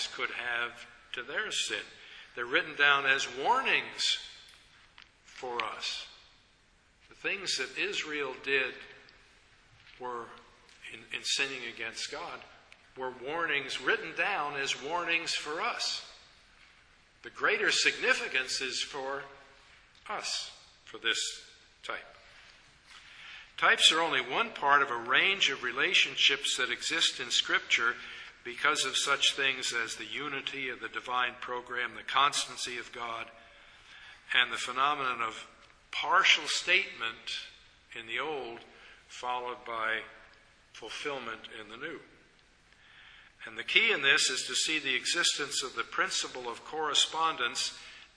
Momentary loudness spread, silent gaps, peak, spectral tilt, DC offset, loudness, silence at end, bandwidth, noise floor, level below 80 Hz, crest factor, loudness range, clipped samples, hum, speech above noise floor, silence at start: 20 LU; none; -6 dBFS; 0 dB/octave; under 0.1%; -29 LUFS; 0.1 s; 11 kHz; -65 dBFS; -70 dBFS; 28 dB; 11 LU; under 0.1%; none; 34 dB; 0 s